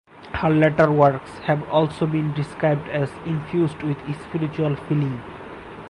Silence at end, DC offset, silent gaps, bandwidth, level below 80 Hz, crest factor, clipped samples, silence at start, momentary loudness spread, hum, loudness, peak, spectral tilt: 0 s; under 0.1%; none; 10.5 kHz; -48 dBFS; 18 dB; under 0.1%; 0.15 s; 12 LU; none; -22 LUFS; -4 dBFS; -8.5 dB/octave